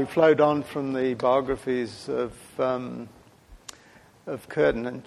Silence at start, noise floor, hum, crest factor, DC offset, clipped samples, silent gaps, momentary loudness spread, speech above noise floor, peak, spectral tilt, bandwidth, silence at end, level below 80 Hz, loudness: 0 s; -54 dBFS; none; 18 dB; under 0.1%; under 0.1%; none; 24 LU; 29 dB; -6 dBFS; -6.5 dB/octave; 13.5 kHz; 0.05 s; -54 dBFS; -25 LUFS